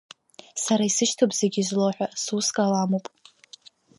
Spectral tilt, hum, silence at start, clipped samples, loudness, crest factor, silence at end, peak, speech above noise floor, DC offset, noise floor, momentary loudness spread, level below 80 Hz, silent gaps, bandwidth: -4 dB/octave; none; 0.55 s; under 0.1%; -24 LUFS; 18 dB; 1 s; -6 dBFS; 28 dB; under 0.1%; -51 dBFS; 8 LU; -76 dBFS; none; 11.5 kHz